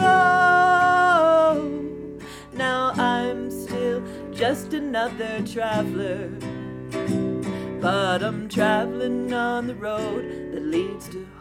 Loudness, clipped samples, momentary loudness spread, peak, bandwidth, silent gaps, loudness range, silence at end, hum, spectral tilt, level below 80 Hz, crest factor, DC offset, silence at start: -22 LUFS; under 0.1%; 16 LU; -6 dBFS; 16.5 kHz; none; 7 LU; 0 s; none; -5.5 dB/octave; -52 dBFS; 16 dB; under 0.1%; 0 s